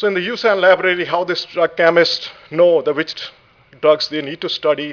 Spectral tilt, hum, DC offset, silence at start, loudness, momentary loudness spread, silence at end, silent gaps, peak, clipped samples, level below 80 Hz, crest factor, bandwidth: -4.5 dB/octave; none; under 0.1%; 0 s; -16 LUFS; 10 LU; 0 s; none; 0 dBFS; under 0.1%; -64 dBFS; 16 dB; 5.4 kHz